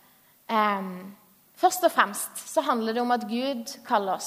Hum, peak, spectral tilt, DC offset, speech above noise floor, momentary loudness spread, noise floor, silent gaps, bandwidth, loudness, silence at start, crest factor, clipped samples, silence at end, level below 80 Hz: none; -4 dBFS; -3 dB/octave; under 0.1%; 25 dB; 11 LU; -51 dBFS; none; 15.5 kHz; -26 LUFS; 0.5 s; 22 dB; under 0.1%; 0 s; -82 dBFS